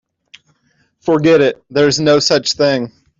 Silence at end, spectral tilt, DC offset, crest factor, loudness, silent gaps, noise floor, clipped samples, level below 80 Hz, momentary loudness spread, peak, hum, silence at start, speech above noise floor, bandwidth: 0.3 s; -4.5 dB/octave; under 0.1%; 14 dB; -13 LUFS; none; -60 dBFS; under 0.1%; -54 dBFS; 6 LU; -2 dBFS; none; 1.05 s; 47 dB; 7.8 kHz